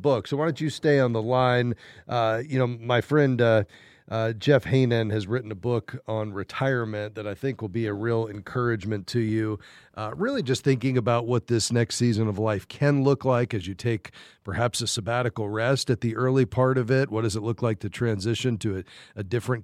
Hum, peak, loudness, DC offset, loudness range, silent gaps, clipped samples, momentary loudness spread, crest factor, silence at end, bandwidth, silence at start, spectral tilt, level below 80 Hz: none; -6 dBFS; -25 LUFS; under 0.1%; 5 LU; none; under 0.1%; 9 LU; 18 dB; 0 s; 13.5 kHz; 0 s; -6 dB/octave; -58 dBFS